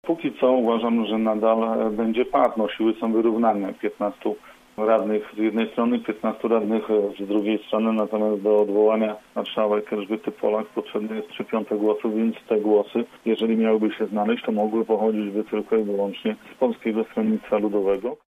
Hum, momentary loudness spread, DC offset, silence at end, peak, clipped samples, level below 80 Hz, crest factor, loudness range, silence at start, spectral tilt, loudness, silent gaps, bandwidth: none; 7 LU; under 0.1%; 0.15 s; -6 dBFS; under 0.1%; -64 dBFS; 18 dB; 3 LU; 0.05 s; -7.5 dB/octave; -23 LUFS; none; 4.7 kHz